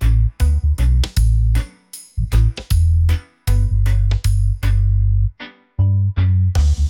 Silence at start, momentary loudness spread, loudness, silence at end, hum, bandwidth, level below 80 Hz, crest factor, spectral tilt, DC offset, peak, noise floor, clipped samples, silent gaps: 0 s; 7 LU; -18 LUFS; 0 s; none; 16 kHz; -18 dBFS; 12 dB; -6 dB/octave; under 0.1%; -4 dBFS; -40 dBFS; under 0.1%; none